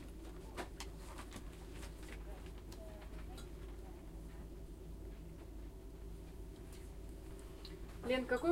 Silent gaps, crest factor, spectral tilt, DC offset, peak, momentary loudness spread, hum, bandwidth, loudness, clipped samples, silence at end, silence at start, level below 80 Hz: none; 22 dB; -5.5 dB/octave; under 0.1%; -24 dBFS; 5 LU; none; 16 kHz; -49 LUFS; under 0.1%; 0 s; 0 s; -52 dBFS